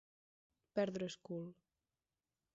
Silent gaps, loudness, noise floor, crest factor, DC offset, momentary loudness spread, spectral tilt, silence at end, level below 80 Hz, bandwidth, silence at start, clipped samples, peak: none; -43 LUFS; under -90 dBFS; 22 dB; under 0.1%; 9 LU; -5.5 dB/octave; 1 s; -82 dBFS; 7.6 kHz; 0.75 s; under 0.1%; -26 dBFS